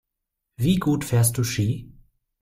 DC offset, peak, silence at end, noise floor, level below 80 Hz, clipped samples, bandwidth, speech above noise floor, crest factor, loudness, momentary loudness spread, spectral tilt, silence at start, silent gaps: under 0.1%; -8 dBFS; 0.55 s; -82 dBFS; -48 dBFS; under 0.1%; 16 kHz; 61 dB; 16 dB; -23 LUFS; 6 LU; -5.5 dB/octave; 0.6 s; none